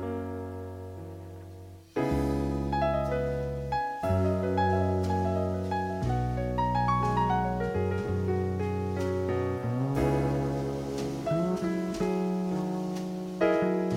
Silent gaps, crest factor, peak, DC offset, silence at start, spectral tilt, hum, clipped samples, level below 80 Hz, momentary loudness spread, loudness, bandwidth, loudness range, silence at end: none; 16 dB; -12 dBFS; under 0.1%; 0 s; -8 dB/octave; none; under 0.1%; -44 dBFS; 11 LU; -29 LUFS; 16 kHz; 3 LU; 0 s